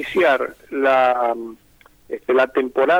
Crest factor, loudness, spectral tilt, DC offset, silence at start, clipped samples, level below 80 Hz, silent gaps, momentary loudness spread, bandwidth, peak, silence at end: 14 dB; -19 LUFS; -5 dB/octave; under 0.1%; 0 s; under 0.1%; -58 dBFS; none; 14 LU; 16 kHz; -4 dBFS; 0 s